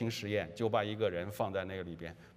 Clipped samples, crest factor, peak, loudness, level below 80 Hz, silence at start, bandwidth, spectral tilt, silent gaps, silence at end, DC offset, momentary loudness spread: under 0.1%; 18 dB; -18 dBFS; -36 LUFS; -68 dBFS; 0 s; 15.5 kHz; -6 dB/octave; none; 0 s; under 0.1%; 9 LU